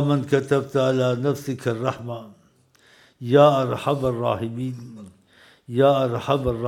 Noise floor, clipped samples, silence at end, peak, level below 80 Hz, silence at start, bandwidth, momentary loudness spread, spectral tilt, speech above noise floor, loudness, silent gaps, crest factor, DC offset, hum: -58 dBFS; under 0.1%; 0 s; -2 dBFS; -52 dBFS; 0 s; 15.5 kHz; 16 LU; -7 dB/octave; 37 dB; -21 LUFS; none; 20 dB; under 0.1%; none